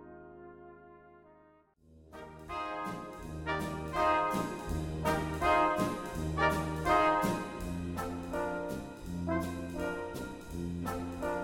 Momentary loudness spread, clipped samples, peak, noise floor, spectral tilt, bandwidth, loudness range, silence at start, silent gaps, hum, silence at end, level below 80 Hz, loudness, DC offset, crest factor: 21 LU; under 0.1%; -14 dBFS; -63 dBFS; -6 dB/octave; 17 kHz; 10 LU; 0 s; none; none; 0 s; -48 dBFS; -34 LUFS; under 0.1%; 20 dB